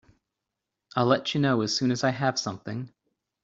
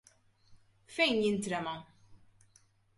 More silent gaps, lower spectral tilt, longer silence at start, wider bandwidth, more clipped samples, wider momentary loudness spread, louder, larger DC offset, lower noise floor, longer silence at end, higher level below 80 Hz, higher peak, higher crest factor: neither; about the same, -5 dB/octave vs -4 dB/octave; first, 0.95 s vs 0.5 s; second, 7.8 kHz vs 11.5 kHz; neither; second, 12 LU vs 15 LU; first, -26 LUFS vs -32 LUFS; neither; first, -85 dBFS vs -67 dBFS; second, 0.55 s vs 0.8 s; about the same, -66 dBFS vs -70 dBFS; first, -8 dBFS vs -18 dBFS; about the same, 20 dB vs 20 dB